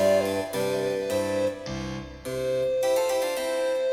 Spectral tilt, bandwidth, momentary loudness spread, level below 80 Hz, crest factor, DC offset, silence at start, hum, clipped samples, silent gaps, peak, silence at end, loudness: -4.5 dB/octave; 16.5 kHz; 9 LU; -52 dBFS; 14 dB; under 0.1%; 0 s; none; under 0.1%; none; -12 dBFS; 0 s; -27 LUFS